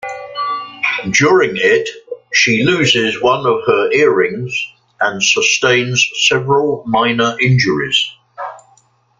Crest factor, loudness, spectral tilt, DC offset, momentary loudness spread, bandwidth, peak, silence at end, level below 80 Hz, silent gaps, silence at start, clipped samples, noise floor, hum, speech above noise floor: 14 dB; -13 LUFS; -3.5 dB/octave; under 0.1%; 11 LU; 9.2 kHz; 0 dBFS; 0.6 s; -52 dBFS; none; 0.05 s; under 0.1%; -53 dBFS; none; 40 dB